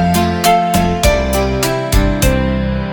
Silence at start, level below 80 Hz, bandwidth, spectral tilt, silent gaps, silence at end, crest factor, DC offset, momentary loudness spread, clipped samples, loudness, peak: 0 s; -20 dBFS; 19 kHz; -5 dB/octave; none; 0 s; 12 dB; under 0.1%; 4 LU; under 0.1%; -14 LUFS; 0 dBFS